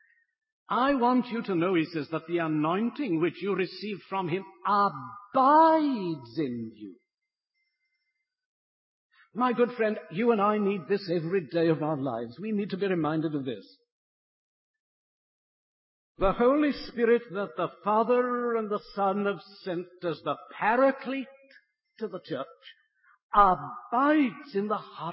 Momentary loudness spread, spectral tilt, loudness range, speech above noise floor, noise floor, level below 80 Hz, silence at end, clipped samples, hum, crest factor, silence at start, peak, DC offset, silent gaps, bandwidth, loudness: 12 LU; -10.5 dB/octave; 8 LU; 62 dB; -89 dBFS; -56 dBFS; 0 s; under 0.1%; none; 20 dB; 0.7 s; -8 dBFS; under 0.1%; 8.45-9.10 s, 13.92-14.74 s, 14.80-16.15 s, 23.23-23.29 s; 5.8 kHz; -27 LUFS